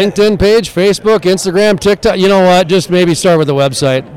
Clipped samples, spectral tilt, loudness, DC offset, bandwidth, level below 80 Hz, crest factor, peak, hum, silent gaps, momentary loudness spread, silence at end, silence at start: under 0.1%; -5 dB/octave; -10 LUFS; under 0.1%; 16 kHz; -34 dBFS; 8 dB; -2 dBFS; none; none; 4 LU; 0 s; 0 s